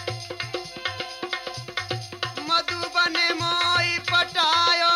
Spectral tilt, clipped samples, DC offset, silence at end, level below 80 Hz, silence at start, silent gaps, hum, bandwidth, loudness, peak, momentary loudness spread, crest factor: -2.5 dB/octave; under 0.1%; under 0.1%; 0 s; -62 dBFS; 0 s; none; none; 15.5 kHz; -23 LUFS; -8 dBFS; 12 LU; 16 dB